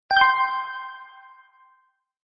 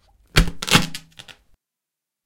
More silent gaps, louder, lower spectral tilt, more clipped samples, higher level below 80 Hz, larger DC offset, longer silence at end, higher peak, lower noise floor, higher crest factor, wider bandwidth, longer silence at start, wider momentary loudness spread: neither; about the same, -21 LUFS vs -19 LUFS; about the same, -4 dB/octave vs -3.5 dB/octave; neither; second, -62 dBFS vs -30 dBFS; neither; first, 1.25 s vs 0.95 s; second, -4 dBFS vs 0 dBFS; second, -65 dBFS vs -85 dBFS; about the same, 22 dB vs 22 dB; second, 5.8 kHz vs 17 kHz; second, 0.1 s vs 0.35 s; first, 21 LU vs 14 LU